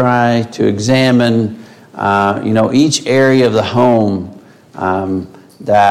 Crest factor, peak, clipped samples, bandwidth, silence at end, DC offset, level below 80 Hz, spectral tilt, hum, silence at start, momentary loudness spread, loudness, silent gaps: 12 dB; 0 dBFS; under 0.1%; 13.5 kHz; 0 s; under 0.1%; -52 dBFS; -5.5 dB/octave; none; 0 s; 12 LU; -13 LUFS; none